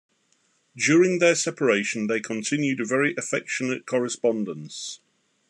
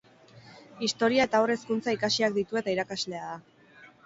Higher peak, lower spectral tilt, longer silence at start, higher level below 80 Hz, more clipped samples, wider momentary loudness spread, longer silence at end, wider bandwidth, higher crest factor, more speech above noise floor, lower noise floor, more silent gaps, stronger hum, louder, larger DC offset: first, -6 dBFS vs -10 dBFS; about the same, -4 dB/octave vs -3.5 dB/octave; first, 0.75 s vs 0.35 s; second, -78 dBFS vs -68 dBFS; neither; first, 14 LU vs 11 LU; first, 0.55 s vs 0.2 s; first, 11.5 kHz vs 8 kHz; about the same, 18 dB vs 18 dB; first, 43 dB vs 27 dB; first, -67 dBFS vs -55 dBFS; neither; neither; first, -24 LUFS vs -27 LUFS; neither